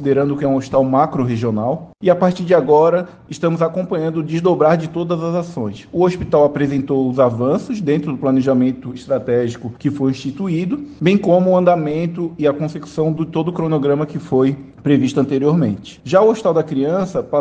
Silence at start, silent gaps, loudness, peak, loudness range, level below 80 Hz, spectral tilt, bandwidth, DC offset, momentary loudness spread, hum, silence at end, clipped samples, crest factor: 0 s; none; -17 LUFS; -2 dBFS; 2 LU; -50 dBFS; -8 dB/octave; 9 kHz; under 0.1%; 8 LU; none; 0 s; under 0.1%; 16 dB